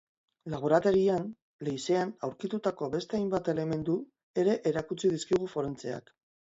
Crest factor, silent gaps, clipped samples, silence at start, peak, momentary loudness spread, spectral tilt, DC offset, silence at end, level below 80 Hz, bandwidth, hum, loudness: 20 dB; 1.42-1.59 s, 4.23-4.34 s; under 0.1%; 0.45 s; -10 dBFS; 13 LU; -6 dB/octave; under 0.1%; 0.5 s; -64 dBFS; 8 kHz; none; -31 LUFS